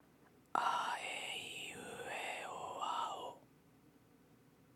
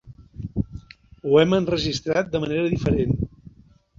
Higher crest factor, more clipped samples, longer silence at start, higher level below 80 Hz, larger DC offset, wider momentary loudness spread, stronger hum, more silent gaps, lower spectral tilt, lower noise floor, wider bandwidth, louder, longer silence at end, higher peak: first, 26 dB vs 18 dB; neither; first, 0.2 s vs 0.05 s; second, -82 dBFS vs -40 dBFS; neither; second, 11 LU vs 15 LU; neither; neither; second, -1.5 dB/octave vs -6.5 dB/octave; first, -67 dBFS vs -53 dBFS; first, 18 kHz vs 7.6 kHz; second, -42 LUFS vs -23 LUFS; second, 0.05 s vs 0.7 s; second, -18 dBFS vs -4 dBFS